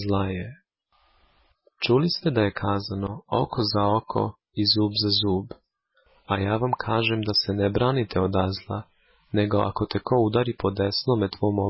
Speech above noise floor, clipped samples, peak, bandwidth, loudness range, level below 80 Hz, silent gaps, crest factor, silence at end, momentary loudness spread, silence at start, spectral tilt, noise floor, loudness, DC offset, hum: 43 dB; under 0.1%; -10 dBFS; 5.8 kHz; 2 LU; -46 dBFS; none; 16 dB; 0 s; 8 LU; 0 s; -9.5 dB/octave; -67 dBFS; -24 LUFS; under 0.1%; none